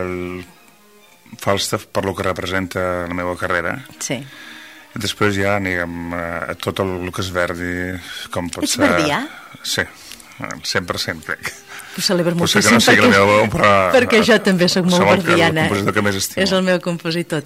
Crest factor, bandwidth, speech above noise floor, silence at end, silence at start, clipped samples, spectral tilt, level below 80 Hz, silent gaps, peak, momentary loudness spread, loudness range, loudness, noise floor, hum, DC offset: 18 dB; 16 kHz; 31 dB; 0 s; 0 s; under 0.1%; -4 dB/octave; -48 dBFS; none; 0 dBFS; 16 LU; 10 LU; -17 LUFS; -49 dBFS; none; 0.1%